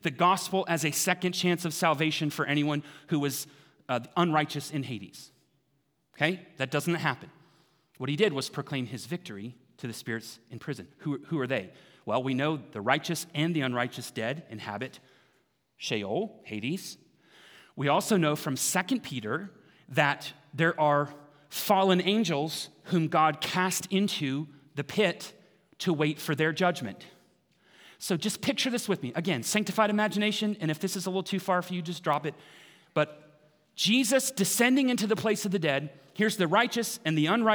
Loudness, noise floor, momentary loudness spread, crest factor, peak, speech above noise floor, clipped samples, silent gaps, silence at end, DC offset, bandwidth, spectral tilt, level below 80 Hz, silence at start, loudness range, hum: -29 LUFS; -74 dBFS; 14 LU; 22 dB; -6 dBFS; 45 dB; under 0.1%; none; 0 s; under 0.1%; over 20 kHz; -4 dB/octave; -78 dBFS; 0.05 s; 7 LU; none